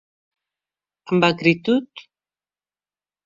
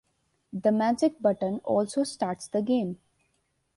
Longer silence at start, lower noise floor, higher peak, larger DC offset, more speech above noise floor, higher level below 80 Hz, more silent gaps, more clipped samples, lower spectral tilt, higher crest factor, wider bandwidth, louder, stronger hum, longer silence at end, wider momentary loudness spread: first, 1.05 s vs 0.55 s; first, under -90 dBFS vs -74 dBFS; first, -2 dBFS vs -12 dBFS; neither; first, over 71 dB vs 47 dB; first, -62 dBFS vs -68 dBFS; neither; neither; about the same, -6.5 dB/octave vs -6 dB/octave; first, 22 dB vs 16 dB; second, 7.6 kHz vs 11.5 kHz; first, -19 LUFS vs -27 LUFS; first, 50 Hz at -55 dBFS vs none; first, 1.25 s vs 0.8 s; about the same, 7 LU vs 9 LU